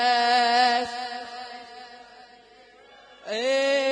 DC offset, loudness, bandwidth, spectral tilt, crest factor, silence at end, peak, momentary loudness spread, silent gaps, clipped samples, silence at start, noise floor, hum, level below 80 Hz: under 0.1%; -23 LUFS; 10.5 kHz; -1 dB/octave; 16 dB; 0 s; -10 dBFS; 23 LU; none; under 0.1%; 0 s; -52 dBFS; none; -72 dBFS